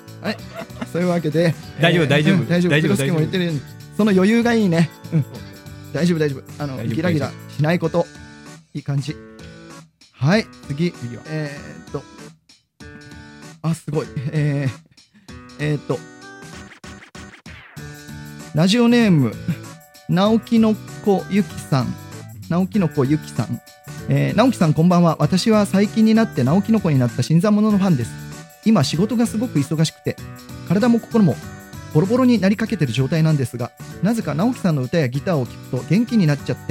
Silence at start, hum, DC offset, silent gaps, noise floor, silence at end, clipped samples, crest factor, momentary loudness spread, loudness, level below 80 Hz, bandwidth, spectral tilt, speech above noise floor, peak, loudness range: 0.05 s; none; under 0.1%; none; -52 dBFS; 0 s; under 0.1%; 18 dB; 21 LU; -19 LUFS; -50 dBFS; 16 kHz; -6.5 dB/octave; 34 dB; 0 dBFS; 10 LU